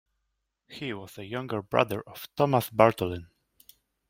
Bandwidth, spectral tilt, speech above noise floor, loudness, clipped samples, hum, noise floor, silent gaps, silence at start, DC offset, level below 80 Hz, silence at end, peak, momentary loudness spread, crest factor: 16.5 kHz; -6 dB/octave; 53 dB; -27 LUFS; under 0.1%; none; -80 dBFS; none; 0.7 s; under 0.1%; -64 dBFS; 0.85 s; -2 dBFS; 17 LU; 26 dB